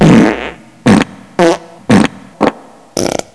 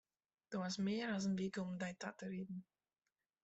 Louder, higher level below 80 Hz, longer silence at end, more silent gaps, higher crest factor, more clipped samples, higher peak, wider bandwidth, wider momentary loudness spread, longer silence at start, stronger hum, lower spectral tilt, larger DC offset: first, -12 LUFS vs -44 LUFS; first, -36 dBFS vs -80 dBFS; second, 0.15 s vs 0.8 s; neither; about the same, 12 dB vs 16 dB; first, 2% vs under 0.1%; first, 0 dBFS vs -28 dBFS; first, 11 kHz vs 8.2 kHz; about the same, 10 LU vs 9 LU; second, 0 s vs 0.5 s; neither; about the same, -6 dB/octave vs -5.5 dB/octave; neither